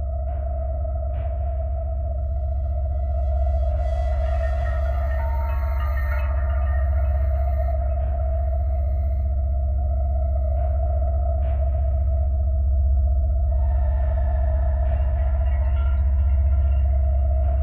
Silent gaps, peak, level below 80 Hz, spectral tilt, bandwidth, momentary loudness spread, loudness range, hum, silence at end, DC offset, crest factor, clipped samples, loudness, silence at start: none; -12 dBFS; -22 dBFS; -10 dB/octave; 2.9 kHz; 5 LU; 3 LU; none; 0 s; 0.2%; 8 dB; under 0.1%; -24 LUFS; 0 s